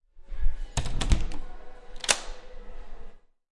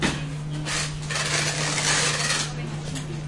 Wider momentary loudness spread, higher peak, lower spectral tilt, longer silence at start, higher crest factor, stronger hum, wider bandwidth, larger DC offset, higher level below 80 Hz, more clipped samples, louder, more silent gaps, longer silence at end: first, 24 LU vs 11 LU; first, -4 dBFS vs -10 dBFS; about the same, -2.5 dB/octave vs -2.5 dB/octave; first, 0.15 s vs 0 s; first, 22 dB vs 16 dB; neither; about the same, 11.5 kHz vs 11.5 kHz; neither; first, -32 dBFS vs -44 dBFS; neither; second, -30 LUFS vs -24 LUFS; neither; first, 0.4 s vs 0 s